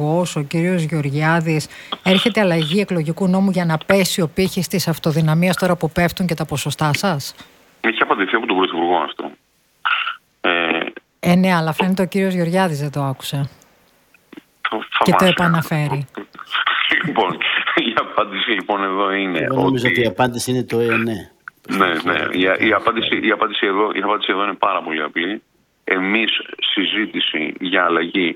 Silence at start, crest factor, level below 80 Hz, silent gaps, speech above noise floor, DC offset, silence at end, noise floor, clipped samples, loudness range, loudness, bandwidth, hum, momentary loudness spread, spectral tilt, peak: 0 s; 18 dB; -52 dBFS; none; 37 dB; under 0.1%; 0 s; -55 dBFS; under 0.1%; 2 LU; -18 LUFS; 18.5 kHz; none; 8 LU; -5 dB/octave; 0 dBFS